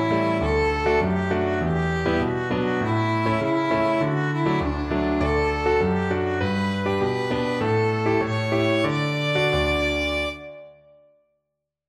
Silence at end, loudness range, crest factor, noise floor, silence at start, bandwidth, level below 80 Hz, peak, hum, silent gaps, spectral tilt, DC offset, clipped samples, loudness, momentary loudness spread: 1.15 s; 1 LU; 14 dB; -80 dBFS; 0 s; 13 kHz; -38 dBFS; -10 dBFS; none; none; -6.5 dB/octave; under 0.1%; under 0.1%; -23 LUFS; 3 LU